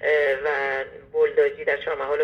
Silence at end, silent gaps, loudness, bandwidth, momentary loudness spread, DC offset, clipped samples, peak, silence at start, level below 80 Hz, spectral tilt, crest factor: 0 s; none; -23 LUFS; 6.2 kHz; 7 LU; under 0.1%; under 0.1%; -8 dBFS; 0 s; -58 dBFS; -4.5 dB/octave; 14 dB